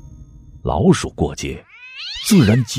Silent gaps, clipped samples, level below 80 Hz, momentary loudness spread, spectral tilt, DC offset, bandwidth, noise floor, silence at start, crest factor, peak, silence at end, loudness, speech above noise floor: none; under 0.1%; -36 dBFS; 17 LU; -5.5 dB/octave; under 0.1%; 15.5 kHz; -40 dBFS; 0.05 s; 18 dB; 0 dBFS; 0 s; -18 LUFS; 25 dB